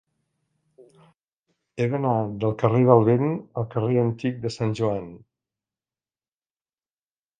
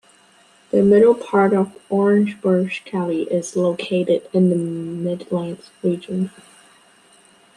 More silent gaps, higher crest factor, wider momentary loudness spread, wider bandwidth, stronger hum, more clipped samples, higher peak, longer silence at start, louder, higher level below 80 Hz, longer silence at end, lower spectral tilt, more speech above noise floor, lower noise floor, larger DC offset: neither; first, 24 dB vs 16 dB; about the same, 12 LU vs 11 LU; second, 9.2 kHz vs 11 kHz; neither; neither; about the same, -2 dBFS vs -4 dBFS; first, 1.75 s vs 0.75 s; second, -23 LUFS vs -19 LUFS; about the same, -60 dBFS vs -64 dBFS; first, 2.25 s vs 1.3 s; first, -8.5 dB/octave vs -7 dB/octave; first, over 68 dB vs 35 dB; first, under -90 dBFS vs -53 dBFS; neither